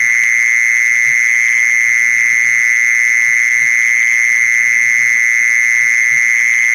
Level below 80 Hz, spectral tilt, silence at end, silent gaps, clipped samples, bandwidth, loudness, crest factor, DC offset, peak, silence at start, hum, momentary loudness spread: -64 dBFS; 2 dB/octave; 0 s; none; under 0.1%; 16 kHz; -9 LUFS; 8 dB; under 0.1%; -4 dBFS; 0 s; none; 0 LU